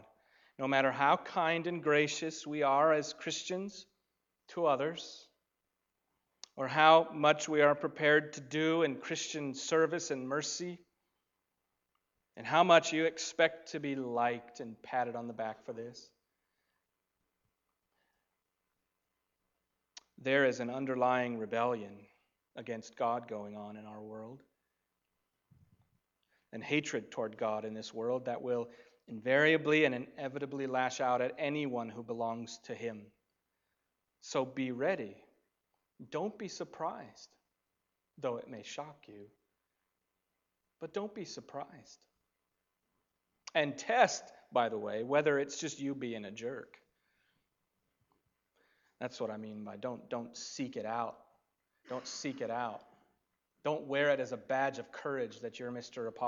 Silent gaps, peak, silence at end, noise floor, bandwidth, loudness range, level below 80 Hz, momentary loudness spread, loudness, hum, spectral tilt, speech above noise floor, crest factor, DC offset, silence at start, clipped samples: none; -10 dBFS; 0 s; -86 dBFS; 7.8 kHz; 16 LU; -84 dBFS; 18 LU; -34 LUFS; none; -4 dB/octave; 52 dB; 26 dB; under 0.1%; 0.6 s; under 0.1%